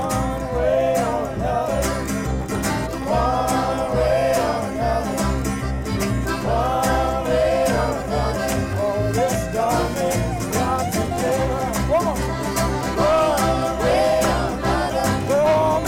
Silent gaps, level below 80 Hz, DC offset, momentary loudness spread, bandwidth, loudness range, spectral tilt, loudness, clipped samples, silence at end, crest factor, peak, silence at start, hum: none; -32 dBFS; under 0.1%; 5 LU; 17 kHz; 2 LU; -5.5 dB/octave; -21 LUFS; under 0.1%; 0 s; 12 dB; -8 dBFS; 0 s; none